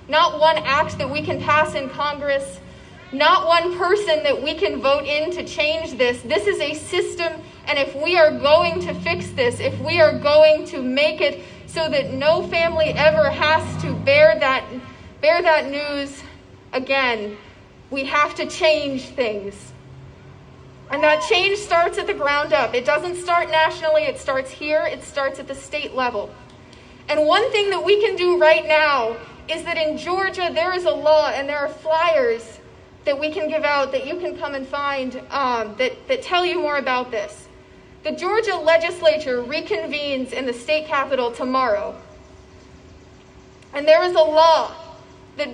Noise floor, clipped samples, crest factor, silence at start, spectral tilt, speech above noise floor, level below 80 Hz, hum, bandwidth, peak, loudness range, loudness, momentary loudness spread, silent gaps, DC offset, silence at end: -46 dBFS; under 0.1%; 18 dB; 0 s; -4 dB/octave; 27 dB; -50 dBFS; none; 10 kHz; -2 dBFS; 5 LU; -19 LUFS; 12 LU; none; under 0.1%; 0 s